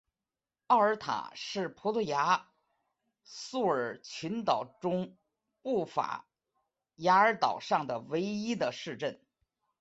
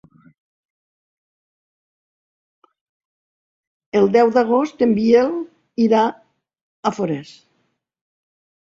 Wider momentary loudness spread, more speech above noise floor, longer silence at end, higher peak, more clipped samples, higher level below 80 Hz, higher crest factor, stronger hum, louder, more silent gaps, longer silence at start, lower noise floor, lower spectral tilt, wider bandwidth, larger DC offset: about the same, 12 LU vs 11 LU; first, over 59 dB vs 53 dB; second, 0.65 s vs 1.45 s; second, -12 dBFS vs -2 dBFS; neither; second, -76 dBFS vs -64 dBFS; about the same, 20 dB vs 20 dB; neither; second, -31 LUFS vs -18 LUFS; second, none vs 6.61-6.83 s; second, 0.7 s vs 3.95 s; first, under -90 dBFS vs -69 dBFS; second, -5 dB/octave vs -7 dB/octave; about the same, 8.2 kHz vs 7.6 kHz; neither